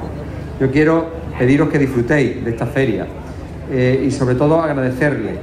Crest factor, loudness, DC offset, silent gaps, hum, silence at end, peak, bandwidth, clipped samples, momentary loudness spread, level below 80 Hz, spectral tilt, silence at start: 12 dB; -16 LUFS; under 0.1%; none; none; 0 s; -4 dBFS; 13.5 kHz; under 0.1%; 14 LU; -36 dBFS; -7.5 dB/octave; 0 s